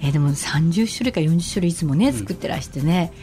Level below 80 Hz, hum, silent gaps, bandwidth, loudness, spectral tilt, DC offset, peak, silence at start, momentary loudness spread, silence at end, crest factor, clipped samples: -42 dBFS; none; none; 15 kHz; -21 LUFS; -6 dB/octave; under 0.1%; -6 dBFS; 0 s; 7 LU; 0 s; 14 dB; under 0.1%